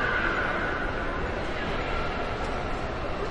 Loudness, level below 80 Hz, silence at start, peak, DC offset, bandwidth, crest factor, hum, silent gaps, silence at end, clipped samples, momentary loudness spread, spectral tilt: -29 LUFS; -36 dBFS; 0 s; -14 dBFS; under 0.1%; 10.5 kHz; 16 dB; none; none; 0 s; under 0.1%; 6 LU; -5.5 dB/octave